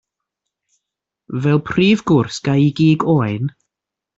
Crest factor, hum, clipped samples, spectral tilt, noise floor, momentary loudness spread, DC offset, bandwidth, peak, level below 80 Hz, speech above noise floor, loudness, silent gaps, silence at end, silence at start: 14 dB; none; under 0.1%; -7 dB/octave; -85 dBFS; 10 LU; under 0.1%; 7.8 kHz; -4 dBFS; -52 dBFS; 70 dB; -16 LUFS; none; 0.7 s; 1.3 s